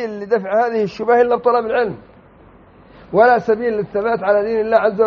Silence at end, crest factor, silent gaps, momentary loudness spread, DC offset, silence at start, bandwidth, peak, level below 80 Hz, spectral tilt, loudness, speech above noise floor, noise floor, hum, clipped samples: 0 s; 16 dB; none; 7 LU; under 0.1%; 0 s; 6.6 kHz; 0 dBFS; -54 dBFS; -4.5 dB/octave; -16 LUFS; 30 dB; -45 dBFS; none; under 0.1%